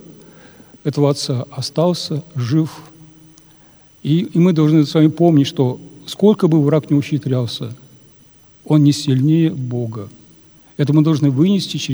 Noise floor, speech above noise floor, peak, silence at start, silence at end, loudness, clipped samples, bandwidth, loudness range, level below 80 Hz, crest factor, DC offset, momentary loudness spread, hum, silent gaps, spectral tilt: -48 dBFS; 33 dB; 0 dBFS; 0.1 s; 0 s; -16 LUFS; under 0.1%; over 20 kHz; 6 LU; -62 dBFS; 16 dB; under 0.1%; 13 LU; none; none; -7 dB/octave